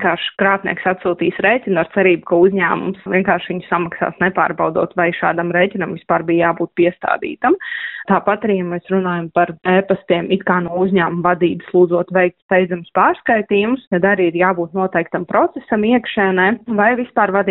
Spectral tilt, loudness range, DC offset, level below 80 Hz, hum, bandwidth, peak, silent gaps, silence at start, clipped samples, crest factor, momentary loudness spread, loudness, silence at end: -4.5 dB/octave; 2 LU; under 0.1%; -54 dBFS; none; 4 kHz; 0 dBFS; 12.42-12.49 s, 13.87-13.91 s; 0 s; under 0.1%; 16 dB; 5 LU; -16 LUFS; 0 s